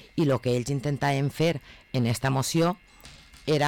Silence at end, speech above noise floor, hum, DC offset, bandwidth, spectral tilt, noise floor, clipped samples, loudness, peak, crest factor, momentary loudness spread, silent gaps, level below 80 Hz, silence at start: 0 s; 24 dB; none; under 0.1%; 18 kHz; -5.5 dB/octave; -50 dBFS; under 0.1%; -26 LUFS; -16 dBFS; 10 dB; 9 LU; none; -54 dBFS; 0.15 s